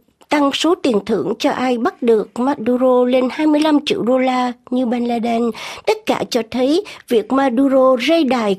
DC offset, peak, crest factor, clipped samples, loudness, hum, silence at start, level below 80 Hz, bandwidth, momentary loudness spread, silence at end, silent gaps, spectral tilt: under 0.1%; -2 dBFS; 14 dB; under 0.1%; -16 LUFS; none; 0.3 s; -60 dBFS; 14.5 kHz; 7 LU; 0 s; none; -5 dB/octave